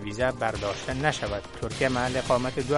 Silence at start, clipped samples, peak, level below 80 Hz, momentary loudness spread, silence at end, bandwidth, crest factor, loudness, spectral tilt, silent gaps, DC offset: 0 s; under 0.1%; -8 dBFS; -44 dBFS; 7 LU; 0 s; 11.5 kHz; 20 dB; -28 LUFS; -5 dB/octave; none; under 0.1%